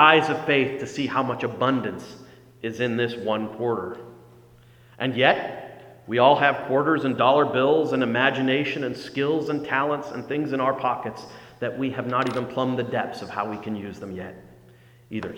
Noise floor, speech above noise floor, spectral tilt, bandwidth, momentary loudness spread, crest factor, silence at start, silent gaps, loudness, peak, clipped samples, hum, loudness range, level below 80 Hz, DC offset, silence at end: -52 dBFS; 28 dB; -6 dB/octave; 16.5 kHz; 15 LU; 24 dB; 0 s; none; -24 LUFS; 0 dBFS; under 0.1%; none; 7 LU; -64 dBFS; under 0.1%; 0 s